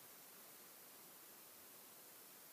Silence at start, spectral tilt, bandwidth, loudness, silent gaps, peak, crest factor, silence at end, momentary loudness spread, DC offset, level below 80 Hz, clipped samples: 0 s; -1 dB/octave; 15.5 kHz; -58 LUFS; none; -48 dBFS; 12 dB; 0 s; 0 LU; under 0.1%; under -90 dBFS; under 0.1%